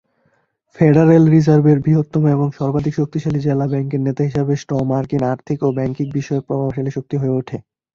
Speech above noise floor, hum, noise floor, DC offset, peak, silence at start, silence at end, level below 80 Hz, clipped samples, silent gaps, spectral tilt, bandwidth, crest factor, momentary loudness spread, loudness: 47 dB; none; -63 dBFS; under 0.1%; -2 dBFS; 0.75 s; 0.35 s; -48 dBFS; under 0.1%; none; -9.5 dB/octave; 7 kHz; 16 dB; 10 LU; -17 LUFS